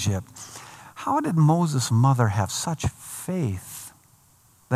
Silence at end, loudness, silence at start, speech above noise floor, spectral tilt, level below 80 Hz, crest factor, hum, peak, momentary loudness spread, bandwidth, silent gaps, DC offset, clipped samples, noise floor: 0 s; -24 LUFS; 0 s; 35 dB; -5.5 dB/octave; -54 dBFS; 20 dB; none; -6 dBFS; 20 LU; 15 kHz; none; under 0.1%; under 0.1%; -58 dBFS